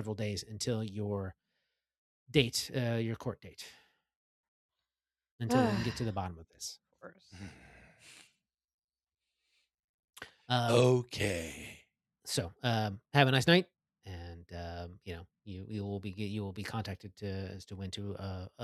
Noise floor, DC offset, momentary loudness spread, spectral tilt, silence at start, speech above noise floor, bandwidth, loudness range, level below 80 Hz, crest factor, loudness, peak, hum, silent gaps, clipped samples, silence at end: under -90 dBFS; under 0.1%; 22 LU; -5 dB/octave; 0 s; over 56 dB; 14 kHz; 10 LU; -64 dBFS; 28 dB; -34 LUFS; -8 dBFS; none; 1.98-2.26 s, 4.16-4.69 s, 5.31-5.39 s, 8.74-8.78 s, 8.84-8.88 s, 9.84-10.08 s; under 0.1%; 0 s